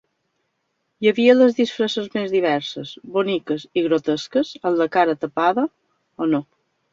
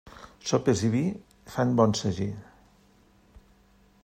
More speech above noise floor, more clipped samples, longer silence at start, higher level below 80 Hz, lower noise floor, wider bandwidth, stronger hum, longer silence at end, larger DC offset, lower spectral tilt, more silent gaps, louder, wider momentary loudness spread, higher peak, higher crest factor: first, 53 dB vs 35 dB; neither; first, 1 s vs 0.05 s; second, -66 dBFS vs -58 dBFS; first, -73 dBFS vs -60 dBFS; second, 7.6 kHz vs 15 kHz; neither; second, 0.5 s vs 1.6 s; neither; about the same, -5.5 dB/octave vs -6 dB/octave; neither; first, -20 LUFS vs -27 LUFS; second, 10 LU vs 18 LU; first, -2 dBFS vs -6 dBFS; about the same, 18 dB vs 22 dB